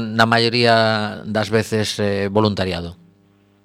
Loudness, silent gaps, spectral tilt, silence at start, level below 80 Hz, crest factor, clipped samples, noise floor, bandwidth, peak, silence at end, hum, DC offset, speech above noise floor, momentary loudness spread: -18 LUFS; none; -5 dB/octave; 0 s; -52 dBFS; 18 dB; under 0.1%; -55 dBFS; 15 kHz; 0 dBFS; 0.7 s; none; under 0.1%; 37 dB; 9 LU